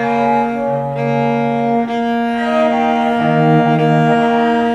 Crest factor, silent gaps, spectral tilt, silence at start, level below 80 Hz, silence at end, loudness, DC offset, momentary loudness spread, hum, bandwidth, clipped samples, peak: 12 dB; none; -8 dB/octave; 0 s; -50 dBFS; 0 s; -14 LUFS; under 0.1%; 5 LU; none; 8.2 kHz; under 0.1%; -2 dBFS